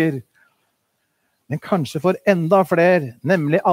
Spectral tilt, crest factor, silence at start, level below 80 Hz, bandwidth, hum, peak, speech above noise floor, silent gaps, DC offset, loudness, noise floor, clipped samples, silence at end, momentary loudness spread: -7.5 dB/octave; 20 dB; 0 s; -66 dBFS; 16 kHz; none; 0 dBFS; 53 dB; none; under 0.1%; -18 LUFS; -70 dBFS; under 0.1%; 0 s; 12 LU